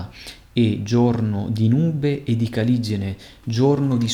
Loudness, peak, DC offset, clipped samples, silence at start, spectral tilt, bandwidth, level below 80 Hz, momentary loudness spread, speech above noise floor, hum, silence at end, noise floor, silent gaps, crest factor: -21 LUFS; -6 dBFS; under 0.1%; under 0.1%; 0 s; -7.5 dB/octave; 12 kHz; -50 dBFS; 10 LU; 21 dB; none; 0 s; -40 dBFS; none; 14 dB